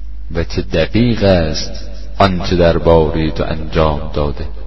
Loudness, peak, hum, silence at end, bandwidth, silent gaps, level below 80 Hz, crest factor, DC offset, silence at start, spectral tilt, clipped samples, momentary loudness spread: -15 LUFS; 0 dBFS; none; 0 s; 6.2 kHz; none; -24 dBFS; 16 dB; 8%; 0 s; -6.5 dB/octave; under 0.1%; 11 LU